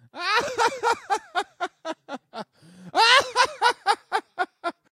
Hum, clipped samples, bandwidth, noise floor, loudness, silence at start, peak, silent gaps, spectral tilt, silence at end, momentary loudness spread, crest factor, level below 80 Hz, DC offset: none; under 0.1%; 15.5 kHz; -48 dBFS; -23 LUFS; 0.15 s; -2 dBFS; none; -0.5 dB/octave; 0.3 s; 20 LU; 22 dB; -70 dBFS; under 0.1%